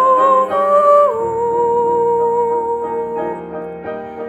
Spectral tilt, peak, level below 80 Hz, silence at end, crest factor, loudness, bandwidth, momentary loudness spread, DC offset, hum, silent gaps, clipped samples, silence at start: -6.5 dB/octave; -2 dBFS; -54 dBFS; 0 s; 14 dB; -15 LUFS; 10 kHz; 15 LU; under 0.1%; none; none; under 0.1%; 0 s